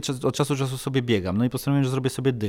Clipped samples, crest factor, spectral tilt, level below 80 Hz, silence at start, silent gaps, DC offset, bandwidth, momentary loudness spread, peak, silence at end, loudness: under 0.1%; 16 dB; -6 dB/octave; -54 dBFS; 0 s; none; under 0.1%; 16.5 kHz; 3 LU; -8 dBFS; 0 s; -24 LUFS